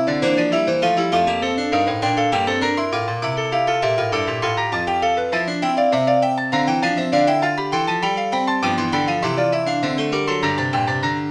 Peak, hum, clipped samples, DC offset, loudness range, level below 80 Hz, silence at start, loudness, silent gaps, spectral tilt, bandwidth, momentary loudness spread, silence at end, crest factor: -6 dBFS; none; under 0.1%; under 0.1%; 1 LU; -54 dBFS; 0 s; -20 LUFS; none; -5 dB/octave; 10.5 kHz; 3 LU; 0 s; 14 dB